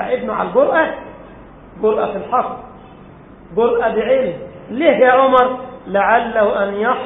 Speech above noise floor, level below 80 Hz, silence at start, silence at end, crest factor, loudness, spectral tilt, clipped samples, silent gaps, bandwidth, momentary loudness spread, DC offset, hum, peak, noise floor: 25 dB; -48 dBFS; 0 s; 0 s; 16 dB; -16 LUFS; -8.5 dB/octave; under 0.1%; none; 4 kHz; 15 LU; under 0.1%; none; 0 dBFS; -40 dBFS